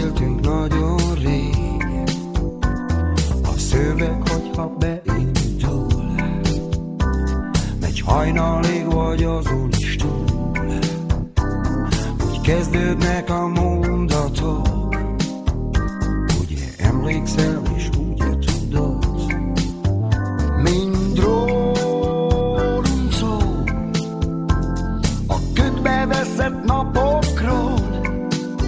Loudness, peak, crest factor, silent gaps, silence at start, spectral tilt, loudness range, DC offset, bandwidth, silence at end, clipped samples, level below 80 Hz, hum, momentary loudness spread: -20 LUFS; -2 dBFS; 16 dB; none; 0 s; -6.5 dB/octave; 2 LU; under 0.1%; 8 kHz; 0 s; under 0.1%; -24 dBFS; none; 5 LU